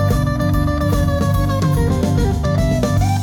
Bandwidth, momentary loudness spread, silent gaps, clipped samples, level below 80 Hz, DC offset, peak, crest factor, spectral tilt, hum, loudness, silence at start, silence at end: 18 kHz; 1 LU; none; under 0.1%; -24 dBFS; under 0.1%; -6 dBFS; 10 dB; -7 dB/octave; none; -17 LUFS; 0 s; 0 s